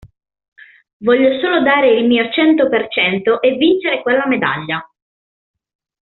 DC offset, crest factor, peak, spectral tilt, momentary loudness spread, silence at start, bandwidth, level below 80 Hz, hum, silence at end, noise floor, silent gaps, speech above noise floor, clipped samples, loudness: under 0.1%; 14 dB; -2 dBFS; -2.5 dB/octave; 6 LU; 0.05 s; 4.3 kHz; -58 dBFS; none; 1.15 s; under -90 dBFS; 0.48-0.52 s, 0.93-1.00 s; over 76 dB; under 0.1%; -14 LUFS